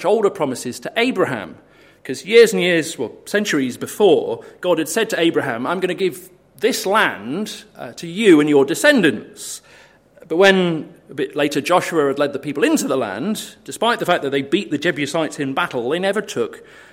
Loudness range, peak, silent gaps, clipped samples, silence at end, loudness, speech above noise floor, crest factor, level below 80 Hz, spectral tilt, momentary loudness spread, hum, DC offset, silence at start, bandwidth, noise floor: 4 LU; 0 dBFS; none; under 0.1%; 0.3 s; -18 LUFS; 30 dB; 18 dB; -64 dBFS; -4 dB/octave; 16 LU; none; under 0.1%; 0 s; 16.5 kHz; -48 dBFS